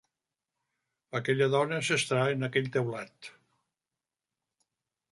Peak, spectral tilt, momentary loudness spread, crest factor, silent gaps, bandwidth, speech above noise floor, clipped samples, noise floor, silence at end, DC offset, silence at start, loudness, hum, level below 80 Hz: -12 dBFS; -4.5 dB/octave; 17 LU; 20 dB; none; 11.5 kHz; over 61 dB; under 0.1%; under -90 dBFS; 1.8 s; under 0.1%; 1.15 s; -29 LUFS; none; -76 dBFS